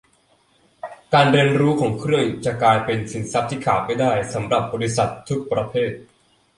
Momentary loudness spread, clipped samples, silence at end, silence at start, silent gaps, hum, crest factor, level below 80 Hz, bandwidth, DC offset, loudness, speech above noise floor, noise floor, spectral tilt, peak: 10 LU; under 0.1%; 0.55 s; 0.85 s; none; none; 18 dB; -52 dBFS; 11.5 kHz; under 0.1%; -20 LUFS; 40 dB; -60 dBFS; -5.5 dB/octave; -2 dBFS